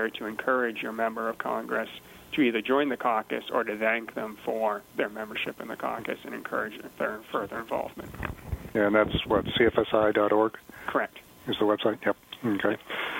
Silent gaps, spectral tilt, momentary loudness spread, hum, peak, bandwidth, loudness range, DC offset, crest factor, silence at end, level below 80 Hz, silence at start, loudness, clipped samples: none; -6 dB/octave; 12 LU; none; -6 dBFS; 16.5 kHz; 7 LU; under 0.1%; 22 dB; 0 s; -52 dBFS; 0 s; -28 LUFS; under 0.1%